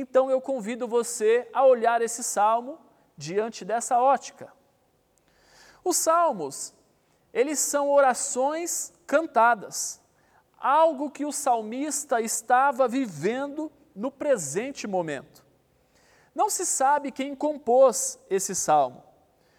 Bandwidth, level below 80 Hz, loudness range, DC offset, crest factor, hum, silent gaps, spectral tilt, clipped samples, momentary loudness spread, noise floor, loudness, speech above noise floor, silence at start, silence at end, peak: 17 kHz; -74 dBFS; 5 LU; under 0.1%; 16 dB; none; none; -3 dB/octave; under 0.1%; 12 LU; -66 dBFS; -25 LUFS; 42 dB; 0 s; 0.6 s; -8 dBFS